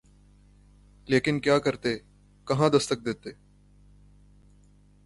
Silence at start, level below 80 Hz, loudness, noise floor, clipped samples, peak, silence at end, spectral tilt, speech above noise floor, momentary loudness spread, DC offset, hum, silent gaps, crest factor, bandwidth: 1.1 s; -56 dBFS; -26 LUFS; -57 dBFS; under 0.1%; -8 dBFS; 1.7 s; -5.5 dB/octave; 32 dB; 15 LU; under 0.1%; 50 Hz at -50 dBFS; none; 20 dB; 11.5 kHz